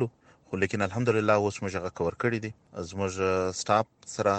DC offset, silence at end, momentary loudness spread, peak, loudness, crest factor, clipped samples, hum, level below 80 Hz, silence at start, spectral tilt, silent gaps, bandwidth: under 0.1%; 0 s; 11 LU; -8 dBFS; -28 LUFS; 20 dB; under 0.1%; none; -60 dBFS; 0 s; -5.5 dB/octave; none; 9.2 kHz